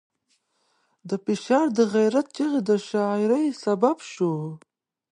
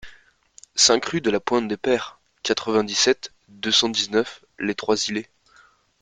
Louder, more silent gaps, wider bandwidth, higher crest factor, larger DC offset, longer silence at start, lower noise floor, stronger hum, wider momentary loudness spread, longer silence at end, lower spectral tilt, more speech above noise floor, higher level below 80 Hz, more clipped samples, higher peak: second, -24 LUFS vs -21 LUFS; neither; about the same, 10.5 kHz vs 10 kHz; about the same, 18 dB vs 22 dB; neither; first, 1.05 s vs 0.05 s; first, -71 dBFS vs -56 dBFS; neither; second, 10 LU vs 14 LU; second, 0.55 s vs 0.8 s; first, -6 dB/octave vs -2 dB/octave; first, 48 dB vs 34 dB; second, -76 dBFS vs -60 dBFS; neither; second, -6 dBFS vs -2 dBFS